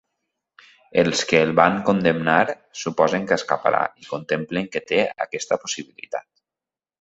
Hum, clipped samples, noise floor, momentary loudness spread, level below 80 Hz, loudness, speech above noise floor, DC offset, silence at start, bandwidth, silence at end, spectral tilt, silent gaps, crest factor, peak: none; under 0.1%; under -90 dBFS; 12 LU; -60 dBFS; -21 LUFS; over 69 dB; under 0.1%; 0.95 s; 8.2 kHz; 0.8 s; -4.5 dB/octave; none; 22 dB; 0 dBFS